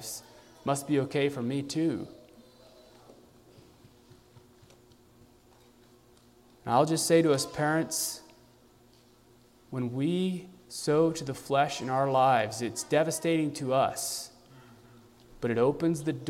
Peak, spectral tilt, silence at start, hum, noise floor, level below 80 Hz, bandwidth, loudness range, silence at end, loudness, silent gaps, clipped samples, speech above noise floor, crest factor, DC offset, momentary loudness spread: -10 dBFS; -5 dB/octave; 0 s; none; -60 dBFS; -66 dBFS; 16 kHz; 7 LU; 0 s; -29 LUFS; none; under 0.1%; 32 dB; 20 dB; under 0.1%; 14 LU